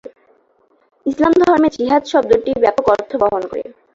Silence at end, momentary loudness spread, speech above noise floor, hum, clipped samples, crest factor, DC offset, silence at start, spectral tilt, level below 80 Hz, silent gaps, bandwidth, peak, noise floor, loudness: 0.25 s; 12 LU; 43 dB; none; under 0.1%; 14 dB; under 0.1%; 0.05 s; -5.5 dB/octave; -48 dBFS; none; 7.8 kHz; -2 dBFS; -57 dBFS; -15 LUFS